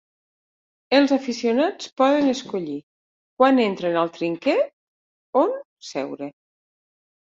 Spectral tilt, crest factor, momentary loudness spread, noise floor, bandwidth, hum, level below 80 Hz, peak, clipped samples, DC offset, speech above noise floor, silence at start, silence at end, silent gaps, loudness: -5 dB/octave; 20 dB; 14 LU; under -90 dBFS; 7.8 kHz; none; -70 dBFS; -4 dBFS; under 0.1%; under 0.1%; over 69 dB; 0.9 s; 1 s; 1.92-1.96 s, 2.83-3.37 s, 4.73-5.33 s, 5.65-5.77 s; -22 LUFS